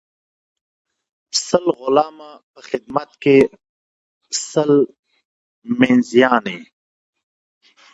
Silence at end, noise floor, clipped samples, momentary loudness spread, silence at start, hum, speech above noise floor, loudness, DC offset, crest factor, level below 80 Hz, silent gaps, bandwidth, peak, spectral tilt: 1.3 s; under -90 dBFS; under 0.1%; 13 LU; 1.35 s; none; over 73 dB; -17 LUFS; under 0.1%; 20 dB; -60 dBFS; 2.43-2.54 s, 3.69-4.21 s, 4.99-5.03 s, 5.25-5.62 s; 8 kHz; 0 dBFS; -4.5 dB/octave